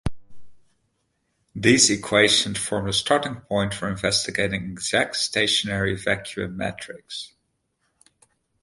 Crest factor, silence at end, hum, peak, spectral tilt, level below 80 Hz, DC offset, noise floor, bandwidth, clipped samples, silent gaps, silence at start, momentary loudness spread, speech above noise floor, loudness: 24 dB; 1.35 s; none; -2 dBFS; -3 dB/octave; -48 dBFS; under 0.1%; -73 dBFS; 11.5 kHz; under 0.1%; none; 0.05 s; 17 LU; 50 dB; -21 LUFS